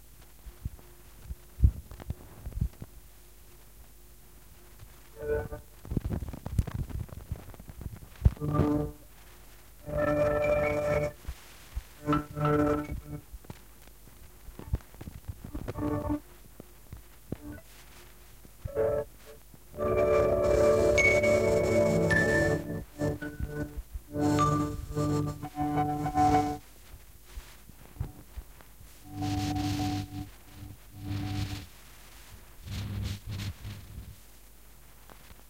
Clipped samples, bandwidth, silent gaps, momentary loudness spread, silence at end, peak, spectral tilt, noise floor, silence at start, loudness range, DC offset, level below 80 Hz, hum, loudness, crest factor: under 0.1%; 16.5 kHz; none; 25 LU; 0.15 s; -8 dBFS; -6.5 dB/octave; -54 dBFS; 0.2 s; 14 LU; 0.2%; -42 dBFS; none; -30 LUFS; 24 dB